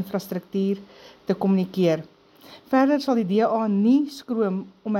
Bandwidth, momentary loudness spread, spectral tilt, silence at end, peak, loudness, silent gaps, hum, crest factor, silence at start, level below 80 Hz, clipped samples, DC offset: 16 kHz; 10 LU; -7.5 dB/octave; 0 s; -6 dBFS; -23 LUFS; none; none; 16 dB; 0 s; -70 dBFS; under 0.1%; under 0.1%